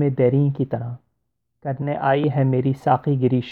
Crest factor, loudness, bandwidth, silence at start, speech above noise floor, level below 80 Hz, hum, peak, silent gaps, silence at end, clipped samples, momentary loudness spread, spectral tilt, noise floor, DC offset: 16 dB; -21 LUFS; 4.3 kHz; 0 s; 56 dB; -60 dBFS; none; -6 dBFS; none; 0 s; under 0.1%; 13 LU; -10 dB/octave; -76 dBFS; under 0.1%